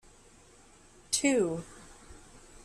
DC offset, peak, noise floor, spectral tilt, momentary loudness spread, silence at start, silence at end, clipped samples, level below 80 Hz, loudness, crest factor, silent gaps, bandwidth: under 0.1%; -14 dBFS; -58 dBFS; -3 dB/octave; 26 LU; 1.1 s; 0.1 s; under 0.1%; -60 dBFS; -29 LUFS; 20 dB; none; 13.5 kHz